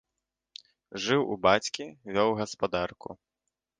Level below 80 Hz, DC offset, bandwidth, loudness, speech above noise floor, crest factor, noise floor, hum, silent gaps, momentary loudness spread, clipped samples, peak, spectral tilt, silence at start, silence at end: -60 dBFS; under 0.1%; 10 kHz; -28 LUFS; 58 dB; 24 dB; -86 dBFS; none; none; 24 LU; under 0.1%; -6 dBFS; -4 dB/octave; 0.9 s; 0.65 s